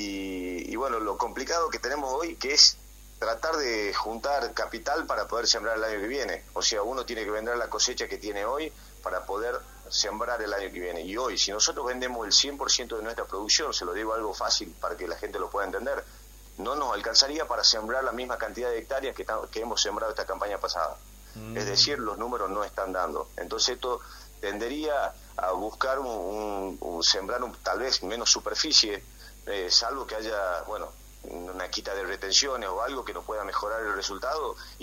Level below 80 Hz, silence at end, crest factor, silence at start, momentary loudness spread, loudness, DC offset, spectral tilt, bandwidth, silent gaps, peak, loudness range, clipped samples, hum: -50 dBFS; 0 s; 26 dB; 0 s; 13 LU; -27 LUFS; under 0.1%; -1 dB/octave; 16 kHz; none; -4 dBFS; 6 LU; under 0.1%; none